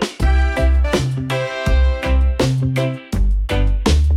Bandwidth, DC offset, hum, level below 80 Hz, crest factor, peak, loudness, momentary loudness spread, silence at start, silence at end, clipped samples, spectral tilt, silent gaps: 12.5 kHz; under 0.1%; none; -18 dBFS; 12 dB; -4 dBFS; -18 LUFS; 5 LU; 0 s; 0 s; under 0.1%; -6 dB/octave; none